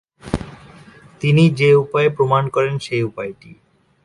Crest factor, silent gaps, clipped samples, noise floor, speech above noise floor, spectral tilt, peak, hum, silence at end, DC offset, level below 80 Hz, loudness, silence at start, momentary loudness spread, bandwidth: 18 dB; none; under 0.1%; -44 dBFS; 28 dB; -7.5 dB/octave; 0 dBFS; none; 0.5 s; under 0.1%; -46 dBFS; -17 LUFS; 0.25 s; 14 LU; 11.5 kHz